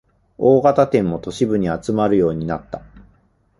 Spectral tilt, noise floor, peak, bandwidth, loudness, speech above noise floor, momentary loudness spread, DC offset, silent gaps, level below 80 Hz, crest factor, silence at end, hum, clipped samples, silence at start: -7.5 dB/octave; -58 dBFS; -2 dBFS; 11.5 kHz; -18 LUFS; 41 dB; 13 LU; under 0.1%; none; -46 dBFS; 18 dB; 0.6 s; none; under 0.1%; 0.4 s